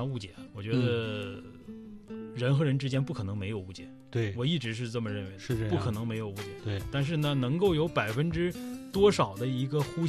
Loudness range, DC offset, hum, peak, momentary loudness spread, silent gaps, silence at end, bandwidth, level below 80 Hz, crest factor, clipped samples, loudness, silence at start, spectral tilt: 4 LU; under 0.1%; none; -12 dBFS; 15 LU; none; 0 s; 13.5 kHz; -54 dBFS; 18 dB; under 0.1%; -31 LUFS; 0 s; -6.5 dB/octave